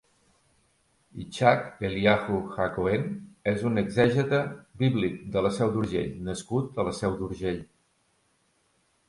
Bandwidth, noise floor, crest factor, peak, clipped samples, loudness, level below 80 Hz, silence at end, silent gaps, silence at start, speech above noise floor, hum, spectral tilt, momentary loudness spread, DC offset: 11.5 kHz; -69 dBFS; 22 dB; -6 dBFS; under 0.1%; -27 LUFS; -52 dBFS; 1.45 s; none; 1.15 s; 43 dB; none; -6.5 dB/octave; 10 LU; under 0.1%